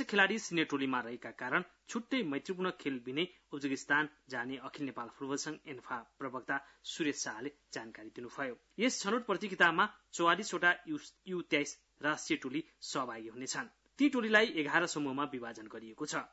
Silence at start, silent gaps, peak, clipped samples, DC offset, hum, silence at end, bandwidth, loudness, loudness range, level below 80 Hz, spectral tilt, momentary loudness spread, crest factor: 0 s; none; -12 dBFS; under 0.1%; under 0.1%; none; 0.05 s; 8 kHz; -35 LUFS; 7 LU; -78 dBFS; -2 dB/octave; 15 LU; 24 dB